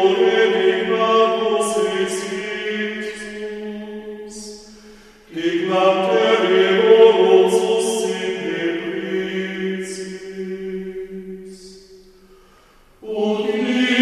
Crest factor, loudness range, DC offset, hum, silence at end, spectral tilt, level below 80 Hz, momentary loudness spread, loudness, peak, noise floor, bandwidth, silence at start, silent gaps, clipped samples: 18 dB; 14 LU; under 0.1%; none; 0 s; -4 dB/octave; -58 dBFS; 19 LU; -18 LUFS; 0 dBFS; -51 dBFS; 13 kHz; 0 s; none; under 0.1%